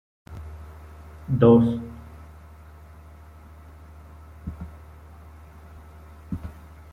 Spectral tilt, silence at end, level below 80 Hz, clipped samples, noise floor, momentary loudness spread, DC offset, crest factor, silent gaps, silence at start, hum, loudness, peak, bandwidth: -10 dB/octave; 0.4 s; -46 dBFS; under 0.1%; -46 dBFS; 28 LU; under 0.1%; 24 dB; none; 0.3 s; none; -21 LUFS; -4 dBFS; 4.3 kHz